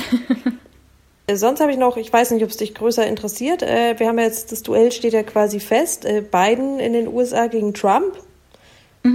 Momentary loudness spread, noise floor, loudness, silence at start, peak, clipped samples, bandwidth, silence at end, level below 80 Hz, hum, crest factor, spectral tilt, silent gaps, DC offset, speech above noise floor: 6 LU; -53 dBFS; -18 LUFS; 0 s; -4 dBFS; under 0.1%; 16.5 kHz; 0 s; -54 dBFS; none; 16 dB; -4 dB/octave; none; under 0.1%; 35 dB